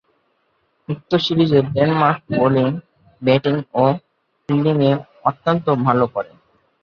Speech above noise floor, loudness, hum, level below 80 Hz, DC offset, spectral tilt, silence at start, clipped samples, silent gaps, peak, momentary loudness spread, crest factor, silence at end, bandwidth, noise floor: 48 dB; -18 LUFS; none; -56 dBFS; under 0.1%; -8.5 dB/octave; 0.9 s; under 0.1%; none; -2 dBFS; 12 LU; 16 dB; 0.6 s; 6.8 kHz; -65 dBFS